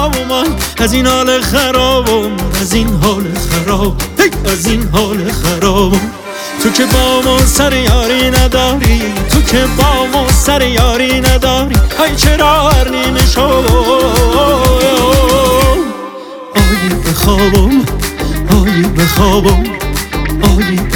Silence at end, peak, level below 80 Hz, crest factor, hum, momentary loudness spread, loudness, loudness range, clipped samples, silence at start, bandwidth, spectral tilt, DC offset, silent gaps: 0 s; 0 dBFS; -16 dBFS; 10 dB; none; 6 LU; -10 LUFS; 3 LU; under 0.1%; 0 s; 19 kHz; -4.5 dB/octave; under 0.1%; none